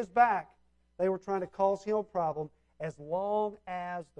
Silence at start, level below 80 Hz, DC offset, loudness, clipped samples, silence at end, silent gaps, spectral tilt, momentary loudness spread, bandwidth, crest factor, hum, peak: 0 s; -68 dBFS; under 0.1%; -32 LUFS; under 0.1%; 0.15 s; none; -7 dB/octave; 14 LU; 9.2 kHz; 20 dB; none; -12 dBFS